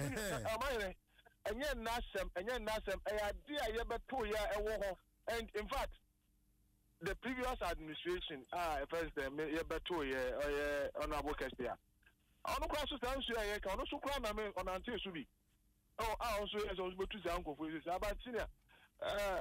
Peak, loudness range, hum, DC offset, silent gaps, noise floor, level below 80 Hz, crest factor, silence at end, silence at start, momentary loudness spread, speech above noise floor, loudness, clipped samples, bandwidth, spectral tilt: -30 dBFS; 3 LU; none; under 0.1%; none; -76 dBFS; -54 dBFS; 12 dB; 0 s; 0 s; 6 LU; 34 dB; -42 LUFS; under 0.1%; 16 kHz; -4 dB/octave